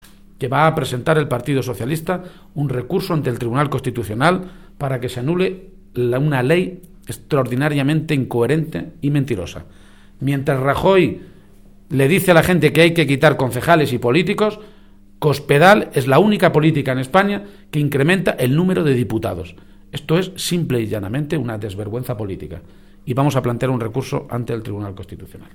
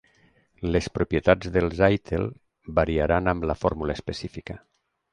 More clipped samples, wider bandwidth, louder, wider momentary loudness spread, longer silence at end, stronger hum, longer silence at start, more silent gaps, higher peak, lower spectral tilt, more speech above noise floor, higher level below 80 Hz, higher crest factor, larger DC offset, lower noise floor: neither; first, 18 kHz vs 10.5 kHz; first, -18 LUFS vs -25 LUFS; about the same, 15 LU vs 13 LU; second, 0.1 s vs 0.55 s; neither; second, 0.4 s vs 0.6 s; neither; first, 0 dBFS vs -6 dBFS; about the same, -6.5 dB/octave vs -7 dB/octave; second, 28 dB vs 38 dB; about the same, -44 dBFS vs -40 dBFS; about the same, 18 dB vs 20 dB; first, 0.4% vs under 0.1%; second, -46 dBFS vs -62 dBFS